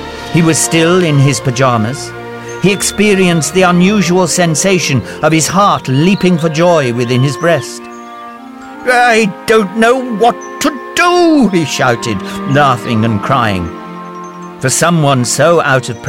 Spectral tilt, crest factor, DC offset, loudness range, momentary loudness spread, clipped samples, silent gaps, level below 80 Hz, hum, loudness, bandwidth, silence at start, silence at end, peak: -4.5 dB/octave; 12 dB; under 0.1%; 3 LU; 16 LU; under 0.1%; none; -42 dBFS; none; -11 LUFS; 16.5 kHz; 0 s; 0 s; 0 dBFS